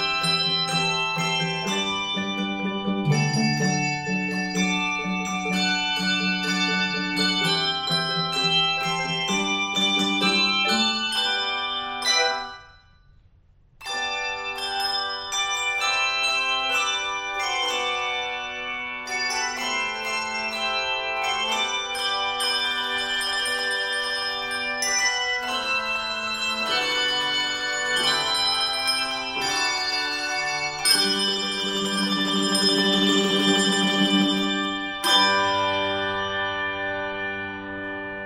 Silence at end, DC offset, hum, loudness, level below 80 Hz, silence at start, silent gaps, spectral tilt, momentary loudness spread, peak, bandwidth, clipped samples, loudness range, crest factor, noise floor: 0 s; under 0.1%; none; -22 LUFS; -56 dBFS; 0 s; none; -2.5 dB/octave; 7 LU; -6 dBFS; 16 kHz; under 0.1%; 5 LU; 20 dB; -56 dBFS